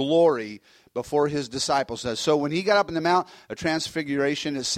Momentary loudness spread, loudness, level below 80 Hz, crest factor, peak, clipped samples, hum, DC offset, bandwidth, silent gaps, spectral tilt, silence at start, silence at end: 12 LU; -24 LUFS; -58 dBFS; 16 dB; -8 dBFS; under 0.1%; none; under 0.1%; 15 kHz; none; -4 dB/octave; 0 s; 0 s